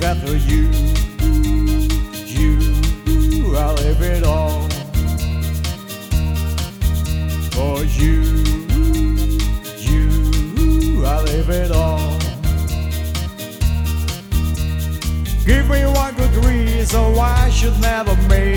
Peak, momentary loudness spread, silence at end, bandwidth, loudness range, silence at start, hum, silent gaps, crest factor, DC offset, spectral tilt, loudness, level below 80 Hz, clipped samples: 0 dBFS; 6 LU; 0 s; 18.5 kHz; 4 LU; 0 s; none; none; 16 dB; under 0.1%; -6 dB/octave; -18 LUFS; -16 dBFS; under 0.1%